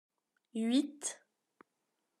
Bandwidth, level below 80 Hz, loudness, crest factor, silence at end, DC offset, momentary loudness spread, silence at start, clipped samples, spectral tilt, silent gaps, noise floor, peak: 13.5 kHz; under -90 dBFS; -36 LUFS; 20 dB; 1.05 s; under 0.1%; 13 LU; 0.55 s; under 0.1%; -3 dB/octave; none; -84 dBFS; -20 dBFS